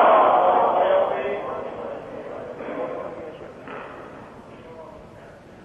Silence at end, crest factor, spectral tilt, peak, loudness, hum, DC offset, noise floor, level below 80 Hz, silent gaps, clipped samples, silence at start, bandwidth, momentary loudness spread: 0 s; 18 dB; -6.5 dB/octave; -6 dBFS; -22 LUFS; none; under 0.1%; -44 dBFS; -58 dBFS; none; under 0.1%; 0 s; 7.4 kHz; 25 LU